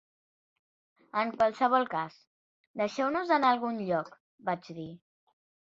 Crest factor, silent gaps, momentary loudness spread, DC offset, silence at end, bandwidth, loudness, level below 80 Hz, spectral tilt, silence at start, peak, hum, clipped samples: 20 dB; 2.27-2.74 s, 4.20-4.38 s; 18 LU; under 0.1%; 0.8 s; 7.8 kHz; -30 LUFS; -74 dBFS; -6 dB/octave; 1.15 s; -12 dBFS; none; under 0.1%